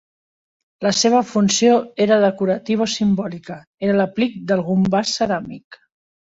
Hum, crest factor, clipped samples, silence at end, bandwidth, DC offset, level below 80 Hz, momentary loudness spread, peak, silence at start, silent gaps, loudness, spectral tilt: none; 16 dB; under 0.1%; 0.55 s; 8 kHz; under 0.1%; -56 dBFS; 10 LU; -2 dBFS; 0.8 s; 3.67-3.78 s, 5.64-5.71 s; -18 LUFS; -4.5 dB/octave